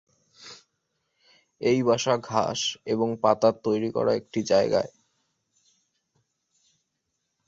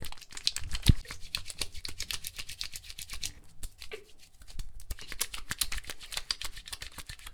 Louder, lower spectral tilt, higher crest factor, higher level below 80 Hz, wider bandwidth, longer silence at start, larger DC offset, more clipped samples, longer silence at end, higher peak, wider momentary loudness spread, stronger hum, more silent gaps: first, -25 LUFS vs -36 LUFS; first, -4.5 dB/octave vs -2.5 dB/octave; second, 22 dB vs 30 dB; second, -66 dBFS vs -40 dBFS; second, 7.8 kHz vs over 20 kHz; first, 0.4 s vs 0 s; neither; neither; first, 2.6 s vs 0 s; about the same, -6 dBFS vs -4 dBFS; second, 9 LU vs 17 LU; neither; neither